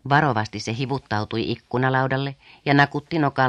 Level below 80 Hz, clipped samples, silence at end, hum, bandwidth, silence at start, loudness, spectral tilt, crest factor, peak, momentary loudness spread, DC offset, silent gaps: -56 dBFS; under 0.1%; 0 s; none; 9.2 kHz; 0.05 s; -23 LUFS; -6.5 dB/octave; 20 dB; -2 dBFS; 9 LU; under 0.1%; none